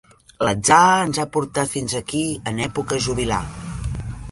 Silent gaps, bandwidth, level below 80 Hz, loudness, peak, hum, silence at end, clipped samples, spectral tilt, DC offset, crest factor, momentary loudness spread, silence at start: none; 11.5 kHz; -38 dBFS; -20 LUFS; -2 dBFS; none; 0 s; under 0.1%; -4 dB/octave; under 0.1%; 20 dB; 15 LU; 0.4 s